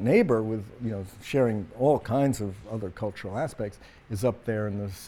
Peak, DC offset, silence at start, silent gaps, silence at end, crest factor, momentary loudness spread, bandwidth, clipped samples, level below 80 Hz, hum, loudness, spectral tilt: -10 dBFS; under 0.1%; 0 s; none; 0 s; 18 dB; 12 LU; 17.5 kHz; under 0.1%; -54 dBFS; none; -28 LUFS; -7 dB/octave